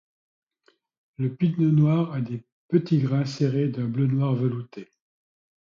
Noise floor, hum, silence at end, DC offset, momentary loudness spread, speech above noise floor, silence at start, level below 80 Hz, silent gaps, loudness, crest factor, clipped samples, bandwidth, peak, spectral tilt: -66 dBFS; none; 0.75 s; under 0.1%; 13 LU; 43 dB; 1.2 s; -64 dBFS; 2.52-2.69 s; -24 LUFS; 18 dB; under 0.1%; 7.4 kHz; -8 dBFS; -9 dB/octave